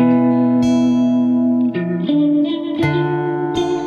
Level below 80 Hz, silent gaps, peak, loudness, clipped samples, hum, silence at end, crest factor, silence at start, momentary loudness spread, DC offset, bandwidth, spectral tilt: -50 dBFS; none; -2 dBFS; -16 LUFS; under 0.1%; none; 0 s; 12 dB; 0 s; 5 LU; under 0.1%; 7 kHz; -7.5 dB/octave